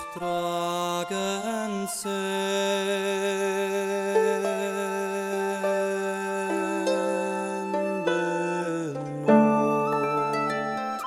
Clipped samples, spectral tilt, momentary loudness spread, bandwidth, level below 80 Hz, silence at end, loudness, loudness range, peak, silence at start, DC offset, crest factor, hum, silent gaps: under 0.1%; -4.5 dB/octave; 6 LU; 16 kHz; -72 dBFS; 0 s; -26 LUFS; 3 LU; -6 dBFS; 0 s; under 0.1%; 20 dB; none; none